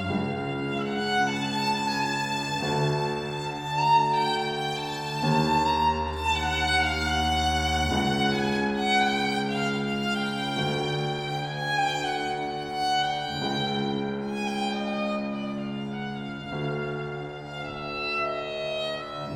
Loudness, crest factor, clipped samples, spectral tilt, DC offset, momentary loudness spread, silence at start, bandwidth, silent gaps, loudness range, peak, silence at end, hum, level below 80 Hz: -27 LUFS; 16 dB; under 0.1%; -4.5 dB/octave; under 0.1%; 9 LU; 0 s; 18 kHz; none; 7 LU; -10 dBFS; 0 s; none; -44 dBFS